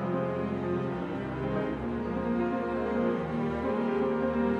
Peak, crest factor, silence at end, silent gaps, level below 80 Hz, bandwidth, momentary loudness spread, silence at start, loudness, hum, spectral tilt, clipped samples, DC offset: -16 dBFS; 14 dB; 0 s; none; -50 dBFS; 7 kHz; 4 LU; 0 s; -31 LUFS; none; -9 dB/octave; under 0.1%; under 0.1%